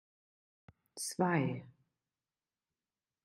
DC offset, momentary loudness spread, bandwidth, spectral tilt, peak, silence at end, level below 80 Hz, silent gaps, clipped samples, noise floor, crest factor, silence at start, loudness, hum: under 0.1%; 15 LU; 12 kHz; -5 dB/octave; -18 dBFS; 1.55 s; -80 dBFS; none; under 0.1%; under -90 dBFS; 22 dB; 0.95 s; -36 LUFS; none